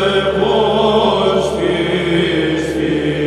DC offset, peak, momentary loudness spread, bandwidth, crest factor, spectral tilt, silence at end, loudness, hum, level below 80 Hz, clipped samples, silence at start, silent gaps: under 0.1%; 0 dBFS; 4 LU; 12.5 kHz; 14 dB; -5.5 dB/octave; 0 s; -15 LUFS; none; -36 dBFS; under 0.1%; 0 s; none